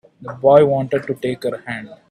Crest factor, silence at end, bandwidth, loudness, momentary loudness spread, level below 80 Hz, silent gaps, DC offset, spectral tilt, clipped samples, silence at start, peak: 18 dB; 0.15 s; 12.5 kHz; -17 LUFS; 17 LU; -58 dBFS; none; under 0.1%; -7.5 dB/octave; under 0.1%; 0.2 s; 0 dBFS